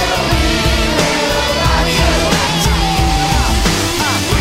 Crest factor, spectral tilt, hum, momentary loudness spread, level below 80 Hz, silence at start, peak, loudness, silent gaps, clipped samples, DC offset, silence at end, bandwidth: 12 dB; -4 dB/octave; none; 1 LU; -20 dBFS; 0 s; 0 dBFS; -13 LUFS; none; under 0.1%; under 0.1%; 0 s; 16.5 kHz